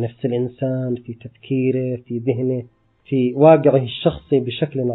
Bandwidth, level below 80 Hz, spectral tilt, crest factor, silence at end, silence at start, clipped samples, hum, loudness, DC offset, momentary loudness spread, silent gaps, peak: 4.1 kHz; -52 dBFS; -12 dB/octave; 18 dB; 0 s; 0 s; under 0.1%; none; -19 LUFS; under 0.1%; 13 LU; none; 0 dBFS